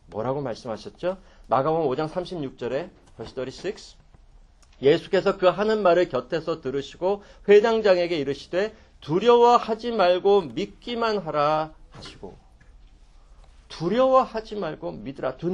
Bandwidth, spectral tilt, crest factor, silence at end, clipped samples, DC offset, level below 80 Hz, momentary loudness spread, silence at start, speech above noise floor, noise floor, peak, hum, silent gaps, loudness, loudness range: 9.4 kHz; -6 dB/octave; 20 dB; 0 s; under 0.1%; under 0.1%; -52 dBFS; 16 LU; 0.1 s; 29 dB; -52 dBFS; -4 dBFS; none; none; -23 LUFS; 8 LU